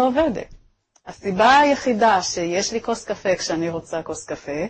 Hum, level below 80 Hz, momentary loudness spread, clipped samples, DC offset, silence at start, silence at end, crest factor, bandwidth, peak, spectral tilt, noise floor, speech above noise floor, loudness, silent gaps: none; -50 dBFS; 15 LU; under 0.1%; under 0.1%; 0 s; 0 s; 16 dB; 8.8 kHz; -4 dBFS; -3.5 dB/octave; -57 dBFS; 37 dB; -20 LUFS; none